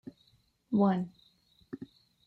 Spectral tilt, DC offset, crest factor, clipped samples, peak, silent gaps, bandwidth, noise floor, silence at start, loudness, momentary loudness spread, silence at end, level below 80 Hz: -10 dB/octave; under 0.1%; 18 dB; under 0.1%; -16 dBFS; none; 4.6 kHz; -69 dBFS; 0.05 s; -30 LUFS; 23 LU; 0.45 s; -74 dBFS